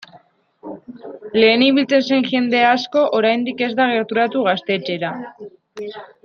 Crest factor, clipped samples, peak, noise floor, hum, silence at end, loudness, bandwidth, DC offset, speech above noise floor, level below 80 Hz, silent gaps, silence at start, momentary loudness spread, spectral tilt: 16 dB; under 0.1%; -2 dBFS; -50 dBFS; none; 0.2 s; -17 LUFS; 6.6 kHz; under 0.1%; 33 dB; -66 dBFS; none; 0.15 s; 21 LU; -5.5 dB/octave